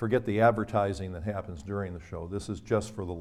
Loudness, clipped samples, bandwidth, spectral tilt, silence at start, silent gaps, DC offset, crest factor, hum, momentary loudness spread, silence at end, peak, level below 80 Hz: -30 LUFS; under 0.1%; 13 kHz; -7 dB/octave; 0 s; none; under 0.1%; 20 dB; none; 13 LU; 0 s; -10 dBFS; -50 dBFS